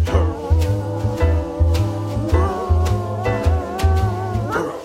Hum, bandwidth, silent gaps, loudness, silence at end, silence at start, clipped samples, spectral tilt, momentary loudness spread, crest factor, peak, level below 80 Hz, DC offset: none; 13.5 kHz; none; -20 LUFS; 0 s; 0 s; under 0.1%; -7.5 dB/octave; 4 LU; 14 dB; -4 dBFS; -24 dBFS; under 0.1%